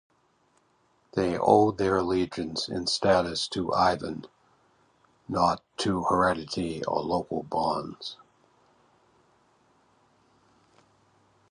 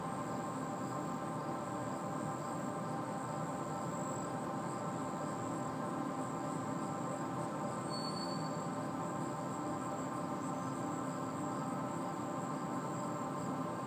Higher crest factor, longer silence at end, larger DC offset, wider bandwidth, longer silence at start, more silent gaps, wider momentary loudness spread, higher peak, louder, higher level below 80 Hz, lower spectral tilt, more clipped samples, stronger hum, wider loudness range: first, 24 dB vs 14 dB; first, 3.35 s vs 0 s; neither; second, 11.5 kHz vs 15.5 kHz; first, 1.15 s vs 0 s; neither; first, 11 LU vs 1 LU; first, -6 dBFS vs -26 dBFS; first, -27 LUFS vs -40 LUFS; first, -56 dBFS vs -74 dBFS; about the same, -5 dB/octave vs -5.5 dB/octave; neither; neither; first, 11 LU vs 1 LU